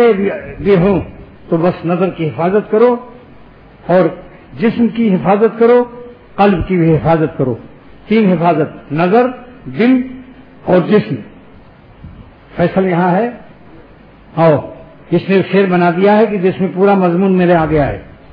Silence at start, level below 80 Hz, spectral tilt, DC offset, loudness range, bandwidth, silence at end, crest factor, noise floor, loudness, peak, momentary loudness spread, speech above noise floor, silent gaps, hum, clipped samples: 0 s; -40 dBFS; -11 dB/octave; under 0.1%; 4 LU; 5.2 kHz; 0.25 s; 14 dB; -40 dBFS; -13 LUFS; 0 dBFS; 14 LU; 28 dB; none; none; under 0.1%